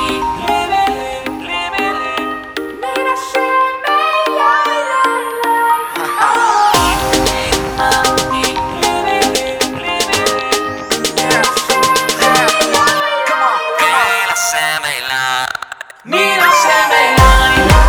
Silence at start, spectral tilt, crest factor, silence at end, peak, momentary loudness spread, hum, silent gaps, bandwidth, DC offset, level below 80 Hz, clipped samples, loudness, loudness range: 0 s; -3 dB/octave; 14 dB; 0 s; 0 dBFS; 9 LU; none; none; over 20 kHz; under 0.1%; -26 dBFS; under 0.1%; -13 LUFS; 4 LU